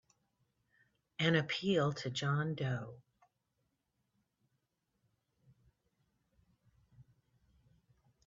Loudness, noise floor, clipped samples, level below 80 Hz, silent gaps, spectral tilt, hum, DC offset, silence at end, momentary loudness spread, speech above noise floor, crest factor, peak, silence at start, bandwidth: -35 LUFS; -83 dBFS; under 0.1%; -76 dBFS; none; -4.5 dB/octave; none; under 0.1%; 1.25 s; 10 LU; 49 dB; 24 dB; -16 dBFS; 1.2 s; 7.4 kHz